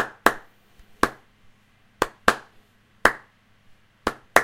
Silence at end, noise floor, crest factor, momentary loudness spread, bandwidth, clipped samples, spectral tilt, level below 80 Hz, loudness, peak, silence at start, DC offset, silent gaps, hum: 0 s; -59 dBFS; 26 dB; 11 LU; 16 kHz; under 0.1%; -2.5 dB/octave; -48 dBFS; -24 LUFS; 0 dBFS; 0 s; under 0.1%; none; none